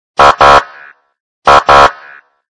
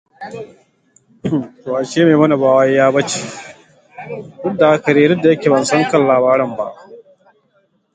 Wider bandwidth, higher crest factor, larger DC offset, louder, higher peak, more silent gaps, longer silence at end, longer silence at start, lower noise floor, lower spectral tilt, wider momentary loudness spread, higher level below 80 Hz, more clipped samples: first, 11 kHz vs 9.4 kHz; second, 8 dB vs 16 dB; neither; first, -6 LUFS vs -14 LUFS; about the same, 0 dBFS vs 0 dBFS; first, 1.20-1.42 s vs none; second, 0.65 s vs 0.95 s; about the same, 0.2 s vs 0.2 s; second, -37 dBFS vs -60 dBFS; second, -3 dB/octave vs -5.5 dB/octave; second, 6 LU vs 19 LU; first, -32 dBFS vs -58 dBFS; first, 4% vs under 0.1%